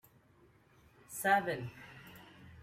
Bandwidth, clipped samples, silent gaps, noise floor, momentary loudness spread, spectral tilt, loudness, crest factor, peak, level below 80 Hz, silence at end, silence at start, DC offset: 16 kHz; under 0.1%; none; -66 dBFS; 24 LU; -4 dB/octave; -34 LUFS; 22 dB; -16 dBFS; -72 dBFS; 0 s; 1.1 s; under 0.1%